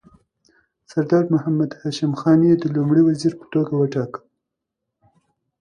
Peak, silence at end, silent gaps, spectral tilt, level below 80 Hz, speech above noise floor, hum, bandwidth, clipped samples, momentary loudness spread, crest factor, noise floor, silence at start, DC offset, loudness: -4 dBFS; 1.45 s; none; -8 dB/octave; -62 dBFS; 63 dB; none; 10 kHz; under 0.1%; 10 LU; 18 dB; -81 dBFS; 0.95 s; under 0.1%; -19 LUFS